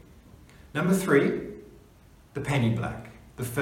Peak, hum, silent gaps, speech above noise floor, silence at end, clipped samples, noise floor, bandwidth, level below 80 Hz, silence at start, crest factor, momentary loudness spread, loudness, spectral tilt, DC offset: -8 dBFS; none; none; 30 dB; 0 s; under 0.1%; -54 dBFS; 17 kHz; -54 dBFS; 0.65 s; 20 dB; 19 LU; -27 LUFS; -6.5 dB/octave; under 0.1%